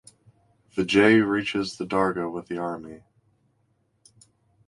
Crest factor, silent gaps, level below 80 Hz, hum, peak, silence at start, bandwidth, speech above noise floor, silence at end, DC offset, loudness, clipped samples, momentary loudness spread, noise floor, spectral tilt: 20 dB; none; -60 dBFS; none; -6 dBFS; 0.75 s; 11.5 kHz; 46 dB; 1.7 s; under 0.1%; -24 LUFS; under 0.1%; 16 LU; -69 dBFS; -5.5 dB/octave